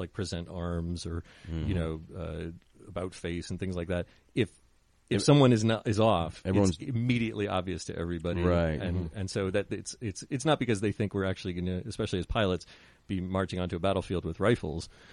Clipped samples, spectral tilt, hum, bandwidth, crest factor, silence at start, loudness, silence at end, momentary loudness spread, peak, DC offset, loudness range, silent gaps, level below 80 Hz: under 0.1%; -6 dB/octave; none; 11.5 kHz; 22 dB; 0 s; -31 LUFS; 0 s; 12 LU; -8 dBFS; under 0.1%; 9 LU; none; -48 dBFS